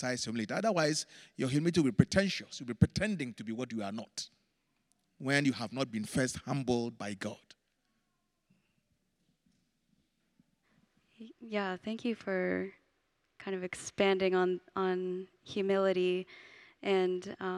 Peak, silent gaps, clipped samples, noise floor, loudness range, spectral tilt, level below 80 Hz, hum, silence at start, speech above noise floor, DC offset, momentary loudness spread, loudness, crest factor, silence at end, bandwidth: -10 dBFS; none; under 0.1%; -80 dBFS; 10 LU; -5.5 dB/octave; -64 dBFS; none; 0 s; 47 dB; under 0.1%; 13 LU; -33 LUFS; 26 dB; 0 s; 13 kHz